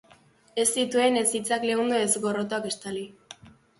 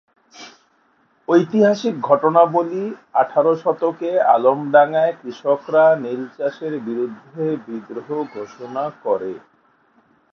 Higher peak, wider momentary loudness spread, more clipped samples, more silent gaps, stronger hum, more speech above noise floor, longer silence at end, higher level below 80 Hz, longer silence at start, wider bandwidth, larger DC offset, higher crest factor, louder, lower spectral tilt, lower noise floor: second, -10 dBFS vs 0 dBFS; about the same, 12 LU vs 13 LU; neither; neither; neither; second, 32 dB vs 42 dB; second, 0.3 s vs 0.95 s; about the same, -68 dBFS vs -72 dBFS; first, 0.55 s vs 0.35 s; first, 12 kHz vs 6.8 kHz; neither; about the same, 18 dB vs 18 dB; second, -25 LUFS vs -18 LUFS; second, -2.5 dB/octave vs -7 dB/octave; about the same, -58 dBFS vs -60 dBFS